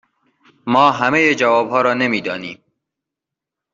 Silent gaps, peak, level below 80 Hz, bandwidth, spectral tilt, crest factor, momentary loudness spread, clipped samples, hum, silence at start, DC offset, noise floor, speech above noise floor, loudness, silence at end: none; 0 dBFS; -62 dBFS; 7.8 kHz; -5 dB/octave; 18 dB; 14 LU; under 0.1%; none; 0.65 s; under 0.1%; -84 dBFS; 69 dB; -15 LUFS; 1.2 s